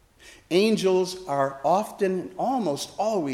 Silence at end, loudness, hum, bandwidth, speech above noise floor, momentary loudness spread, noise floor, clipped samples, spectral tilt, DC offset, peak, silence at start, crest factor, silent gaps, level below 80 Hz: 0 s; -25 LUFS; none; 15 kHz; 28 dB; 6 LU; -52 dBFS; under 0.1%; -5 dB/octave; under 0.1%; -10 dBFS; 0.25 s; 16 dB; none; -64 dBFS